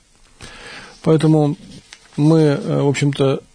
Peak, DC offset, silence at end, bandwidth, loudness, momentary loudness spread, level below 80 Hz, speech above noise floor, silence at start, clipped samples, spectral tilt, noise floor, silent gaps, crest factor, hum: -4 dBFS; under 0.1%; 0.15 s; 10 kHz; -16 LUFS; 21 LU; -52 dBFS; 27 dB; 0.4 s; under 0.1%; -7.5 dB/octave; -42 dBFS; none; 14 dB; none